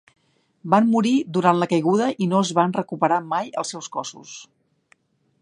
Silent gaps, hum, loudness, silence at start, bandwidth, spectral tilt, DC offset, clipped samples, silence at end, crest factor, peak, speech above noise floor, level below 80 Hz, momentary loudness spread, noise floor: none; none; -21 LUFS; 0.65 s; 10.5 kHz; -5.5 dB/octave; under 0.1%; under 0.1%; 1 s; 20 dB; -2 dBFS; 41 dB; -70 dBFS; 16 LU; -62 dBFS